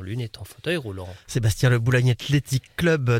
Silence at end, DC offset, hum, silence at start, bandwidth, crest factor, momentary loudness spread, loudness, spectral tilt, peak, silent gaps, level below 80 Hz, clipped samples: 0 s; under 0.1%; none; 0 s; 16 kHz; 18 dB; 13 LU; -23 LUFS; -6 dB/octave; -6 dBFS; none; -46 dBFS; under 0.1%